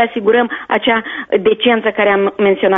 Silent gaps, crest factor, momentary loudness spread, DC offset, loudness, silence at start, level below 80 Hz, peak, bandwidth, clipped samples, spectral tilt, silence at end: none; 14 dB; 4 LU; under 0.1%; -14 LUFS; 0 s; -54 dBFS; 0 dBFS; 3.9 kHz; under 0.1%; -2 dB/octave; 0 s